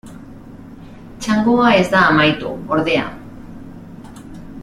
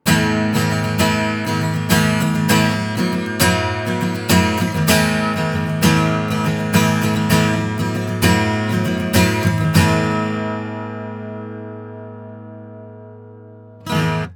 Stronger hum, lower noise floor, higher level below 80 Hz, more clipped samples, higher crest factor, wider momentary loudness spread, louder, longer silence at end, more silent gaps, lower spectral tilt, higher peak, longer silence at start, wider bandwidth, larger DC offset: neither; second, -36 dBFS vs -40 dBFS; about the same, -44 dBFS vs -42 dBFS; neither; about the same, 16 dB vs 18 dB; first, 25 LU vs 17 LU; about the same, -15 LUFS vs -17 LUFS; about the same, 0 s vs 0 s; neither; about the same, -5.5 dB/octave vs -5 dB/octave; about the same, -2 dBFS vs 0 dBFS; about the same, 0.05 s vs 0.05 s; second, 13.5 kHz vs over 20 kHz; neither